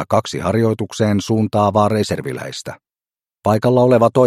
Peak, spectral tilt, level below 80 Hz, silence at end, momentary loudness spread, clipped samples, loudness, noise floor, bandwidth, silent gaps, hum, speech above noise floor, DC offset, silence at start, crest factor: 0 dBFS; -6.5 dB/octave; -52 dBFS; 0 s; 13 LU; under 0.1%; -17 LUFS; under -90 dBFS; 14.5 kHz; none; none; over 74 dB; under 0.1%; 0 s; 16 dB